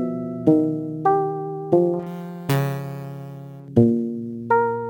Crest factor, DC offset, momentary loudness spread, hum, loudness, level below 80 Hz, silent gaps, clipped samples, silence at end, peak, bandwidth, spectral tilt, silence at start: 18 dB; under 0.1%; 14 LU; none; -22 LUFS; -60 dBFS; none; under 0.1%; 0 s; -4 dBFS; 17 kHz; -8.5 dB/octave; 0 s